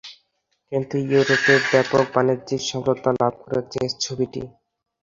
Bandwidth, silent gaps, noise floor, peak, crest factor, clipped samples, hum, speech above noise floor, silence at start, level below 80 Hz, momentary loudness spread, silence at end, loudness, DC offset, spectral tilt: 7.6 kHz; none; -71 dBFS; -2 dBFS; 20 dB; under 0.1%; none; 50 dB; 0.05 s; -58 dBFS; 11 LU; 0.55 s; -21 LUFS; under 0.1%; -4.5 dB/octave